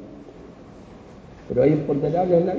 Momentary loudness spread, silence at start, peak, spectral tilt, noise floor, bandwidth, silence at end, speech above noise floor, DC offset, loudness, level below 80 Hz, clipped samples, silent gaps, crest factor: 25 LU; 0 s; -6 dBFS; -10 dB/octave; -43 dBFS; 7.2 kHz; 0 s; 24 dB; under 0.1%; -21 LUFS; -50 dBFS; under 0.1%; none; 16 dB